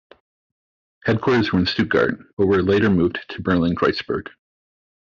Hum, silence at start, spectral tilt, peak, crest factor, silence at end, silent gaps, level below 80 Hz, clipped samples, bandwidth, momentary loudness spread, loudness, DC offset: none; 1.05 s; -5 dB/octave; -6 dBFS; 16 dB; 0.85 s; 2.33-2.37 s; -52 dBFS; under 0.1%; 7.2 kHz; 9 LU; -20 LUFS; under 0.1%